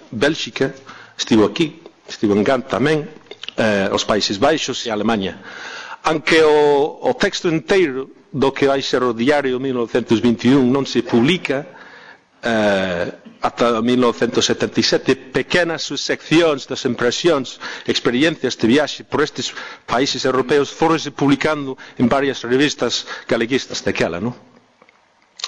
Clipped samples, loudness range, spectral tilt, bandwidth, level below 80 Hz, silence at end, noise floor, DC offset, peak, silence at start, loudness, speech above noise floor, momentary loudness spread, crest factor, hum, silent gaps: under 0.1%; 3 LU; -4.5 dB/octave; 10.5 kHz; -50 dBFS; 0 s; -55 dBFS; under 0.1%; -4 dBFS; 0.1 s; -18 LUFS; 38 dB; 10 LU; 14 dB; none; none